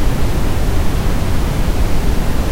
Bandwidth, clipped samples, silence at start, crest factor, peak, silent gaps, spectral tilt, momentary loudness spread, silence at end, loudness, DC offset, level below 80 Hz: 16 kHz; under 0.1%; 0 s; 10 dB; -2 dBFS; none; -6 dB/octave; 0 LU; 0 s; -19 LUFS; under 0.1%; -16 dBFS